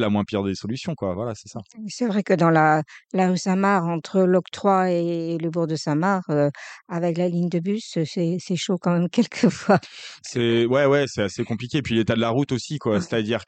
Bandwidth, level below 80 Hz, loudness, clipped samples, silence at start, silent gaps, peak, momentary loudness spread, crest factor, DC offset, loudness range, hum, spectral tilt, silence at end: 9 kHz; -60 dBFS; -22 LUFS; under 0.1%; 0 s; none; -4 dBFS; 10 LU; 18 dB; under 0.1%; 3 LU; none; -6 dB/octave; 0.05 s